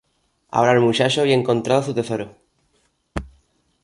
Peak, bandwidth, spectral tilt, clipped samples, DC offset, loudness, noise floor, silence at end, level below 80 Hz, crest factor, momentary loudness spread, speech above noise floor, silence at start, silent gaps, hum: -2 dBFS; 11.5 kHz; -5.5 dB/octave; under 0.1%; under 0.1%; -19 LUFS; -66 dBFS; 0.55 s; -46 dBFS; 18 dB; 17 LU; 48 dB; 0.55 s; none; none